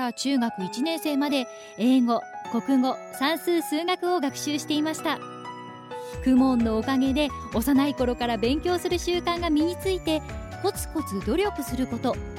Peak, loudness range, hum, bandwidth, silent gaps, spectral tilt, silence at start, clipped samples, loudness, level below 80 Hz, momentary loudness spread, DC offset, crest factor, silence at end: -10 dBFS; 3 LU; none; 17 kHz; none; -4.5 dB/octave; 0 s; under 0.1%; -25 LUFS; -44 dBFS; 8 LU; under 0.1%; 14 dB; 0 s